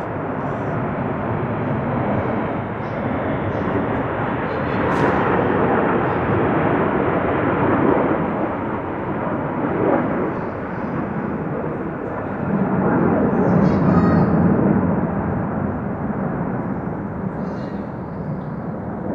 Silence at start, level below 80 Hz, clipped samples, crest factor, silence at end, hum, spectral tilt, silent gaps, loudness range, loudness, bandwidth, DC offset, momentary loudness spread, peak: 0 s; -42 dBFS; under 0.1%; 18 dB; 0 s; none; -10 dB/octave; none; 5 LU; -21 LUFS; 6.4 kHz; under 0.1%; 10 LU; -2 dBFS